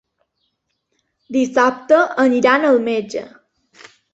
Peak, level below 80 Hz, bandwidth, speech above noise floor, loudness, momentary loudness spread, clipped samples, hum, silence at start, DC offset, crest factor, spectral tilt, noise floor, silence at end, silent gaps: -2 dBFS; -64 dBFS; 8 kHz; 56 dB; -16 LUFS; 10 LU; under 0.1%; none; 1.3 s; under 0.1%; 18 dB; -4.5 dB/octave; -71 dBFS; 0.85 s; none